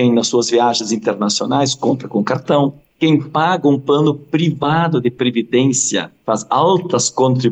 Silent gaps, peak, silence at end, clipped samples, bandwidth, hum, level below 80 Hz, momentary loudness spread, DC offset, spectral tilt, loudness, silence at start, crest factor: none; -2 dBFS; 0 s; under 0.1%; 9.4 kHz; none; -62 dBFS; 5 LU; under 0.1%; -4.5 dB/octave; -16 LUFS; 0 s; 12 dB